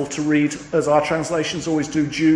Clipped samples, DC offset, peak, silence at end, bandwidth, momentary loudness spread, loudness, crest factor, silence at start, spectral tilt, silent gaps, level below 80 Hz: under 0.1%; under 0.1%; -4 dBFS; 0 s; 10.5 kHz; 4 LU; -20 LUFS; 16 dB; 0 s; -5 dB/octave; none; -52 dBFS